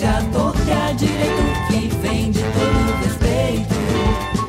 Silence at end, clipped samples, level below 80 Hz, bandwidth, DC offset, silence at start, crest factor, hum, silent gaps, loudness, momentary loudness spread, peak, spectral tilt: 0 s; under 0.1%; -26 dBFS; 16 kHz; under 0.1%; 0 s; 12 dB; none; none; -19 LUFS; 2 LU; -6 dBFS; -6 dB/octave